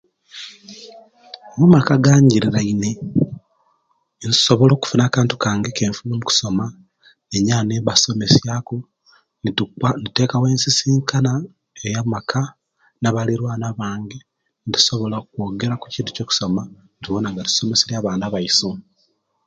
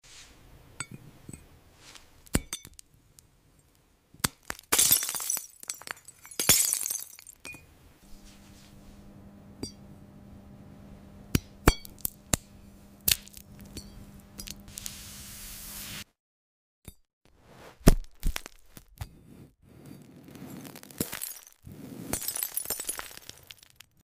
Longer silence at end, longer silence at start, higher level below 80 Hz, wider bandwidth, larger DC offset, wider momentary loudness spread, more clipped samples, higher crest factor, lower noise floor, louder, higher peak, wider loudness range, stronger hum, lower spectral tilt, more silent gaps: second, 0.65 s vs 0.9 s; first, 0.35 s vs 0.1 s; second, -50 dBFS vs -40 dBFS; second, 9.2 kHz vs 16 kHz; neither; second, 18 LU vs 25 LU; neither; second, 20 dB vs 28 dB; about the same, -65 dBFS vs -64 dBFS; first, -18 LUFS vs -29 LUFS; first, 0 dBFS vs -6 dBFS; second, 5 LU vs 16 LU; neither; first, -4.5 dB/octave vs -2.5 dB/octave; second, none vs 16.20-16.82 s, 17.13-17.21 s